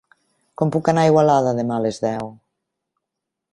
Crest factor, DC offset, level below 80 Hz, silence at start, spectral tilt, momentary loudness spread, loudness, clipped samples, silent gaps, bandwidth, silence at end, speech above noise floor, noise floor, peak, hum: 18 dB; under 0.1%; -58 dBFS; 0.6 s; -7 dB/octave; 11 LU; -19 LUFS; under 0.1%; none; 11 kHz; 1.2 s; 64 dB; -82 dBFS; -2 dBFS; none